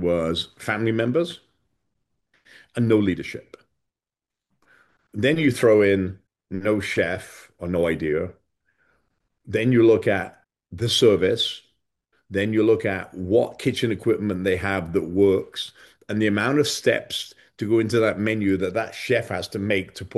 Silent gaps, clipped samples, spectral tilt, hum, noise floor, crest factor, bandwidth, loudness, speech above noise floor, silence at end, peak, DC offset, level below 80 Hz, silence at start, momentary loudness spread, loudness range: none; under 0.1%; -5.5 dB/octave; none; -89 dBFS; 18 dB; 12.5 kHz; -22 LUFS; 68 dB; 0 s; -6 dBFS; under 0.1%; -54 dBFS; 0 s; 15 LU; 5 LU